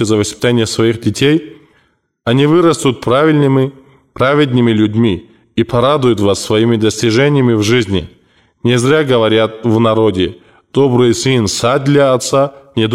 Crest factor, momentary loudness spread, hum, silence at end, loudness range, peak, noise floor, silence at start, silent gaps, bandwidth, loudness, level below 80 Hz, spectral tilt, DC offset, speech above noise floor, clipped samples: 10 dB; 7 LU; none; 0 s; 1 LU; -2 dBFS; -57 dBFS; 0 s; none; 15 kHz; -12 LUFS; -44 dBFS; -5.5 dB/octave; 0.2%; 46 dB; under 0.1%